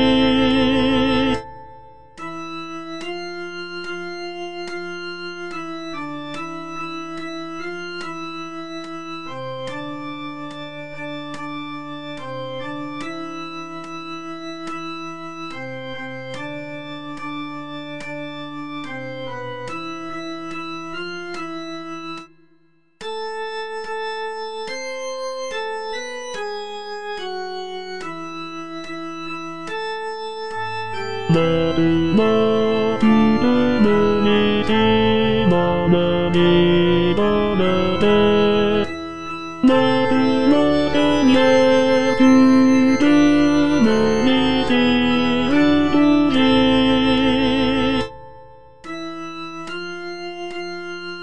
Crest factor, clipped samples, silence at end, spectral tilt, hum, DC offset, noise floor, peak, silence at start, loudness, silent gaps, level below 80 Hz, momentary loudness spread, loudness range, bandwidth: 16 dB; under 0.1%; 0 s; -6 dB/octave; none; 1%; -59 dBFS; -4 dBFS; 0 s; -19 LUFS; none; -44 dBFS; 16 LU; 15 LU; 10 kHz